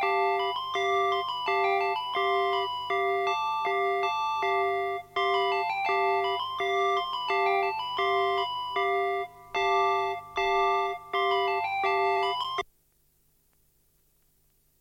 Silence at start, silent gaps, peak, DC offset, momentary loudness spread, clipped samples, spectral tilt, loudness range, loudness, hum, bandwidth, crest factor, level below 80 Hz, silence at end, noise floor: 0 s; none; -14 dBFS; under 0.1%; 4 LU; under 0.1%; -3 dB/octave; 2 LU; -27 LUFS; 50 Hz at -60 dBFS; 16.5 kHz; 14 dB; -64 dBFS; 2.15 s; -67 dBFS